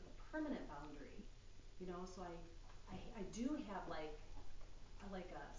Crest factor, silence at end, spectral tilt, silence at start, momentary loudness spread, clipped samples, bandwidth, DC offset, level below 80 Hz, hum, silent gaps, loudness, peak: 18 dB; 0 s; -5.5 dB/octave; 0 s; 17 LU; under 0.1%; 7.6 kHz; under 0.1%; -60 dBFS; none; none; -51 LUFS; -32 dBFS